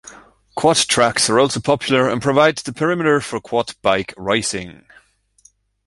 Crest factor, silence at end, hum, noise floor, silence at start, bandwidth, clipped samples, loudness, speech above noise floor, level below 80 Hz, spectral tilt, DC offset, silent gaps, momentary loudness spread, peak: 18 dB; 1.15 s; none; -55 dBFS; 0.05 s; 11.5 kHz; under 0.1%; -17 LUFS; 37 dB; -52 dBFS; -3.5 dB/octave; under 0.1%; none; 8 LU; 0 dBFS